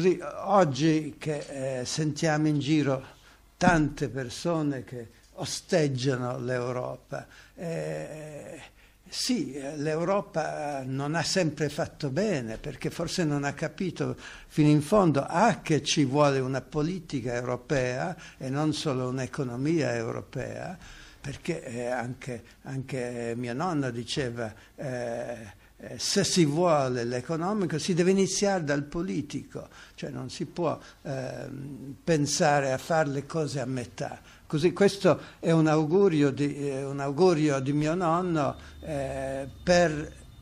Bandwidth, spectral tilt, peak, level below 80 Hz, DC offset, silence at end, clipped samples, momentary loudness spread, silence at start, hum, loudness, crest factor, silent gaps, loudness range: 14.5 kHz; -5.5 dB/octave; -6 dBFS; -54 dBFS; under 0.1%; 0 s; under 0.1%; 15 LU; 0 s; none; -28 LUFS; 22 dB; none; 8 LU